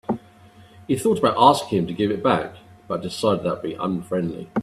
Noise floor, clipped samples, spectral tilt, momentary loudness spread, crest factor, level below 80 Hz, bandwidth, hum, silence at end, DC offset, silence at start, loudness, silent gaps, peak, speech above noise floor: -49 dBFS; under 0.1%; -6 dB/octave; 13 LU; 22 dB; -56 dBFS; 14.5 kHz; none; 0 s; under 0.1%; 0.1 s; -22 LUFS; none; 0 dBFS; 28 dB